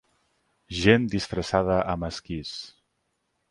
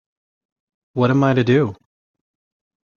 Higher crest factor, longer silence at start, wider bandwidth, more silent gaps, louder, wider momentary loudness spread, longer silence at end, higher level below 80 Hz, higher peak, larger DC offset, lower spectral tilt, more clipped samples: first, 24 dB vs 18 dB; second, 0.7 s vs 0.95 s; first, 11.5 kHz vs 7 kHz; neither; second, -25 LUFS vs -17 LUFS; first, 16 LU vs 10 LU; second, 0.8 s vs 1.2 s; first, -46 dBFS vs -58 dBFS; about the same, -4 dBFS vs -2 dBFS; neither; second, -5.5 dB/octave vs -8 dB/octave; neither